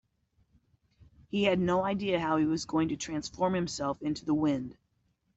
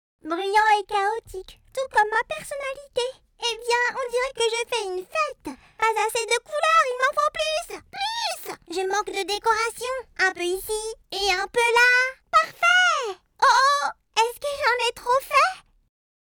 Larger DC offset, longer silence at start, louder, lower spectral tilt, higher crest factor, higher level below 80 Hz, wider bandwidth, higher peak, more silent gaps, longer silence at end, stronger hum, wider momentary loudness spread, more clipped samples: neither; first, 1.35 s vs 0.25 s; second, -30 LUFS vs -23 LUFS; first, -5.5 dB/octave vs -0.5 dB/octave; about the same, 16 dB vs 14 dB; about the same, -60 dBFS vs -56 dBFS; second, 8.2 kHz vs over 20 kHz; second, -14 dBFS vs -8 dBFS; neither; about the same, 0.65 s vs 0.75 s; neither; second, 7 LU vs 13 LU; neither